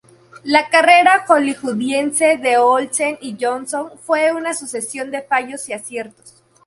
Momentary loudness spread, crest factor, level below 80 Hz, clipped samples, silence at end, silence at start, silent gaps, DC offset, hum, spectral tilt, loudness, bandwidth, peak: 15 LU; 16 dB; -66 dBFS; under 0.1%; 0.35 s; 0.35 s; none; under 0.1%; none; -2 dB/octave; -16 LUFS; 11.5 kHz; 0 dBFS